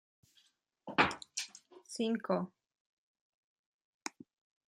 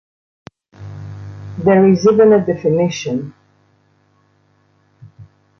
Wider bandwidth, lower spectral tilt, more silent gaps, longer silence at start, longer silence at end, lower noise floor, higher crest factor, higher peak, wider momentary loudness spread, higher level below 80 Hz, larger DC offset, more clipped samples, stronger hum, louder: first, 15.5 kHz vs 7 kHz; second, -3.5 dB/octave vs -7 dB/octave; first, 2.80-3.15 s, 3.21-3.79 s, 3.85-4.00 s vs none; about the same, 0.85 s vs 0.8 s; first, 0.6 s vs 0.35 s; first, -73 dBFS vs -57 dBFS; first, 28 dB vs 16 dB; second, -14 dBFS vs -2 dBFS; second, 16 LU vs 23 LU; second, -74 dBFS vs -52 dBFS; neither; neither; neither; second, -36 LUFS vs -13 LUFS